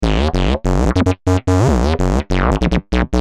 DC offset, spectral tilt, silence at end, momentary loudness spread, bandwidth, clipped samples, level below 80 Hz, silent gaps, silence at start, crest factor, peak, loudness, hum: under 0.1%; -6.5 dB/octave; 0 s; 3 LU; 11.5 kHz; under 0.1%; -20 dBFS; none; 0 s; 14 dB; 0 dBFS; -16 LUFS; none